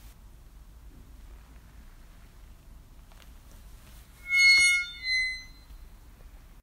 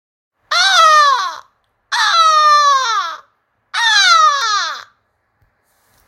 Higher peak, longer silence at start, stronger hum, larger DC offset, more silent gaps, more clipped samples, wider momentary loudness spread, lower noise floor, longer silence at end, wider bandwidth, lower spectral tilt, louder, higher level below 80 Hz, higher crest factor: second, -12 dBFS vs 0 dBFS; second, 0.05 s vs 0.5 s; neither; neither; neither; neither; first, 19 LU vs 15 LU; second, -50 dBFS vs -64 dBFS; second, 0.25 s vs 1.25 s; first, 16 kHz vs 14.5 kHz; first, 1.5 dB/octave vs 4.5 dB/octave; second, -21 LUFS vs -11 LUFS; first, -50 dBFS vs -74 dBFS; first, 20 dB vs 14 dB